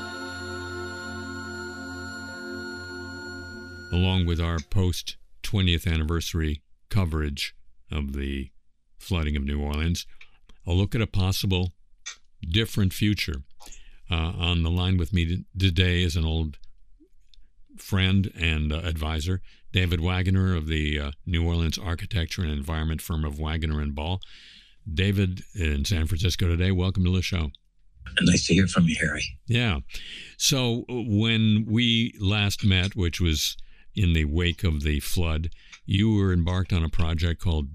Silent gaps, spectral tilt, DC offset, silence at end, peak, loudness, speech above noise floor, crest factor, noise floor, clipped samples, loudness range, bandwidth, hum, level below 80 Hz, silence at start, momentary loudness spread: none; -5 dB/octave; under 0.1%; 0 s; -6 dBFS; -26 LUFS; 25 dB; 20 dB; -50 dBFS; under 0.1%; 6 LU; 15.5 kHz; none; -34 dBFS; 0 s; 14 LU